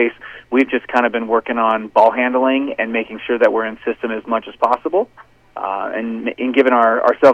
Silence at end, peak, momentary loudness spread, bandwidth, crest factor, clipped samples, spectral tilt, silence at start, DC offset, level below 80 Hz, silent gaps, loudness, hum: 0 s; -2 dBFS; 10 LU; 8 kHz; 16 dB; under 0.1%; -6 dB/octave; 0 s; under 0.1%; -58 dBFS; none; -17 LUFS; none